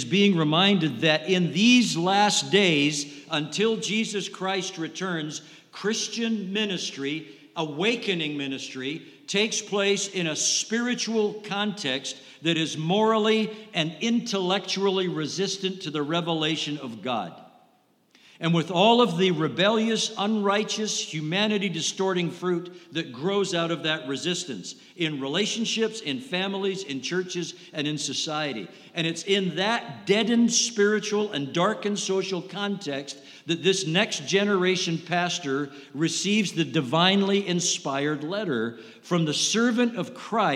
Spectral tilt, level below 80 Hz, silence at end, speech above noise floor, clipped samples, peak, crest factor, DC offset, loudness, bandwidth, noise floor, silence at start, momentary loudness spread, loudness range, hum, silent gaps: -3.5 dB/octave; -84 dBFS; 0 s; 38 dB; under 0.1%; -6 dBFS; 20 dB; under 0.1%; -25 LUFS; 13.5 kHz; -63 dBFS; 0 s; 11 LU; 5 LU; none; none